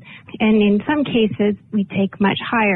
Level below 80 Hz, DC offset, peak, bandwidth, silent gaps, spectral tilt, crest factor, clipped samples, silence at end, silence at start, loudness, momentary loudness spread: -52 dBFS; under 0.1%; -6 dBFS; 4.1 kHz; none; -10 dB/octave; 12 dB; under 0.1%; 0 s; 0.05 s; -18 LUFS; 6 LU